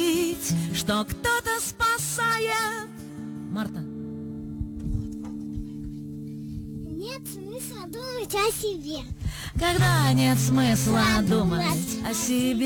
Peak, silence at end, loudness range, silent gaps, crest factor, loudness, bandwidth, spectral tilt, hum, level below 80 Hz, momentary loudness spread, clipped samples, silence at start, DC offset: -12 dBFS; 0 s; 12 LU; none; 14 dB; -26 LUFS; 19 kHz; -4.5 dB/octave; none; -42 dBFS; 15 LU; under 0.1%; 0 s; under 0.1%